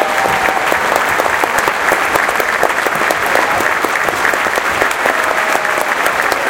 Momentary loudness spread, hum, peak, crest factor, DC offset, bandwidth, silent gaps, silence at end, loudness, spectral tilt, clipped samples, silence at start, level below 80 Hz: 1 LU; none; 0 dBFS; 14 dB; under 0.1%; over 20 kHz; none; 0 s; -13 LUFS; -2 dB/octave; under 0.1%; 0 s; -44 dBFS